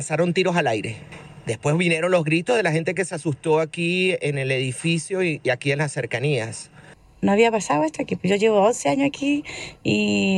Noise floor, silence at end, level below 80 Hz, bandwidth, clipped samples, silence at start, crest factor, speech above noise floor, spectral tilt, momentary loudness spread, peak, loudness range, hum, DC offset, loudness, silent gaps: -48 dBFS; 0 s; -58 dBFS; 12 kHz; under 0.1%; 0 s; 16 dB; 26 dB; -5 dB/octave; 9 LU; -4 dBFS; 2 LU; none; under 0.1%; -22 LUFS; none